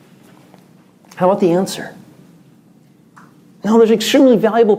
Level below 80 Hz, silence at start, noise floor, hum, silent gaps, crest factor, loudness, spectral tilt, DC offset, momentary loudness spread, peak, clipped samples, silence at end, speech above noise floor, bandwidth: -66 dBFS; 1.15 s; -48 dBFS; none; none; 16 dB; -13 LUFS; -5.5 dB/octave; under 0.1%; 15 LU; 0 dBFS; under 0.1%; 0 s; 36 dB; 16 kHz